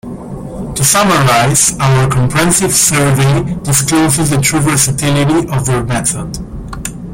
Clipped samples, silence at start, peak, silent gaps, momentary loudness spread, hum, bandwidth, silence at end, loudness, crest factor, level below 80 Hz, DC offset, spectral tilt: under 0.1%; 0.05 s; 0 dBFS; none; 15 LU; none; 17 kHz; 0 s; -11 LUFS; 12 dB; -32 dBFS; under 0.1%; -4 dB/octave